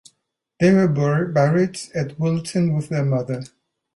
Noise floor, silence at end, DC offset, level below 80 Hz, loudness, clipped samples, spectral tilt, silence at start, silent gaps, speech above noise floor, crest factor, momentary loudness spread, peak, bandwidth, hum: -73 dBFS; 0.5 s; under 0.1%; -56 dBFS; -20 LUFS; under 0.1%; -7.5 dB/octave; 0.6 s; none; 54 dB; 14 dB; 10 LU; -6 dBFS; 11.5 kHz; none